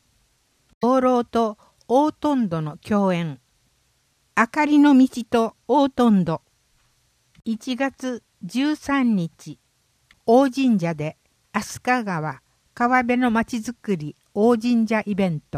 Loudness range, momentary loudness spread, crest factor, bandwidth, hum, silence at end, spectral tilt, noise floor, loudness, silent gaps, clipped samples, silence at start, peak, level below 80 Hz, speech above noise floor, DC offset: 5 LU; 13 LU; 18 dB; 14.5 kHz; none; 0 s; -6.5 dB/octave; -66 dBFS; -21 LUFS; none; under 0.1%; 0.8 s; -4 dBFS; -58 dBFS; 45 dB; under 0.1%